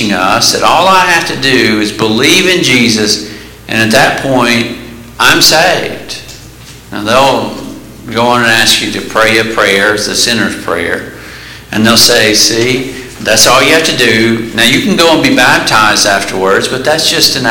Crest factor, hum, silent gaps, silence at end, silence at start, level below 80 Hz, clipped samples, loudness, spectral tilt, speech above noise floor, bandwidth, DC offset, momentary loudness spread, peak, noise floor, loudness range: 10 dB; none; none; 0 s; 0 s; -38 dBFS; 0.6%; -7 LUFS; -2.5 dB/octave; 23 dB; over 20 kHz; under 0.1%; 14 LU; 0 dBFS; -31 dBFS; 3 LU